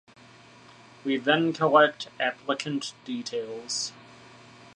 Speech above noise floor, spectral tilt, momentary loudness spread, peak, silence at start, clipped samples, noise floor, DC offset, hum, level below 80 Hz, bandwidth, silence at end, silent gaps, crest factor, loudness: 26 dB; -3.5 dB/octave; 14 LU; -6 dBFS; 1.05 s; under 0.1%; -52 dBFS; under 0.1%; none; -76 dBFS; 11 kHz; 0.8 s; none; 22 dB; -26 LUFS